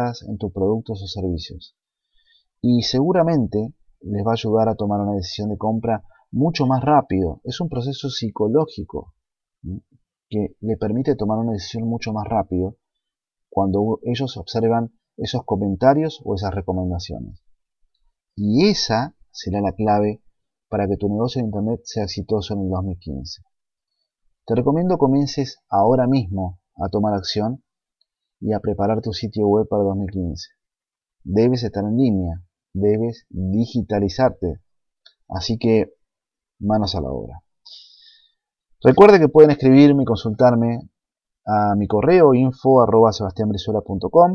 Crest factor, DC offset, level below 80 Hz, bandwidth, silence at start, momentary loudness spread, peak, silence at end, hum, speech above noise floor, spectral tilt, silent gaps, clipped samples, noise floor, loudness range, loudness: 20 dB; under 0.1%; -46 dBFS; 7.2 kHz; 0 s; 15 LU; 0 dBFS; 0 s; none; 71 dB; -7 dB/octave; none; under 0.1%; -90 dBFS; 9 LU; -19 LUFS